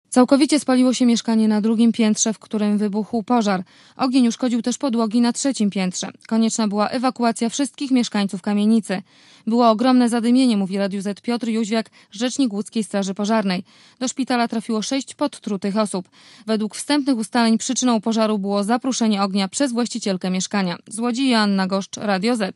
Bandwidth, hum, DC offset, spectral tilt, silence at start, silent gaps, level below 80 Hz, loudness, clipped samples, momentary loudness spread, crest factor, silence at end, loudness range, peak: 12 kHz; none; under 0.1%; -4.5 dB/octave; 0.1 s; none; -72 dBFS; -20 LUFS; under 0.1%; 8 LU; 18 dB; 0.05 s; 4 LU; 0 dBFS